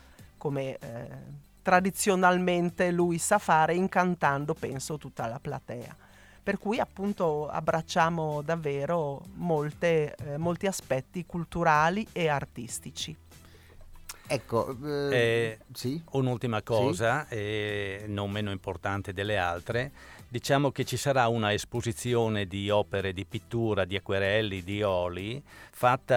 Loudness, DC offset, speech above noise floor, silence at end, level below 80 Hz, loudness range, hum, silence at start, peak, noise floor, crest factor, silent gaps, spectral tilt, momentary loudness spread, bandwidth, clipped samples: -29 LUFS; under 0.1%; 24 dB; 0 s; -56 dBFS; 5 LU; none; 0.2 s; -6 dBFS; -53 dBFS; 22 dB; none; -5 dB/octave; 13 LU; 18.5 kHz; under 0.1%